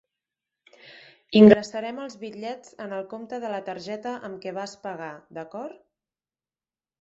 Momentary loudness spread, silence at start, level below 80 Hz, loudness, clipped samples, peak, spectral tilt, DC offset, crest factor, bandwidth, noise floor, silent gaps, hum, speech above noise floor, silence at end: 22 LU; 1.3 s; -64 dBFS; -23 LUFS; under 0.1%; -2 dBFS; -5.5 dB/octave; under 0.1%; 24 dB; 7.8 kHz; under -90 dBFS; none; none; over 66 dB; 1.3 s